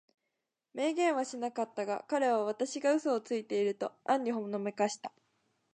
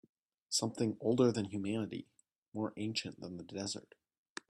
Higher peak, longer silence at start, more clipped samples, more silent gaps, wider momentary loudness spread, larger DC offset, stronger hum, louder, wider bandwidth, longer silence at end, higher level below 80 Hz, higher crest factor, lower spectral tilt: about the same, -16 dBFS vs -16 dBFS; first, 0.75 s vs 0.5 s; neither; second, none vs 2.38-2.52 s; second, 7 LU vs 16 LU; neither; neither; first, -33 LUFS vs -37 LUFS; second, 9.8 kHz vs 13.5 kHz; about the same, 0.65 s vs 0.7 s; second, -88 dBFS vs -76 dBFS; about the same, 18 dB vs 22 dB; about the same, -4.5 dB/octave vs -4.5 dB/octave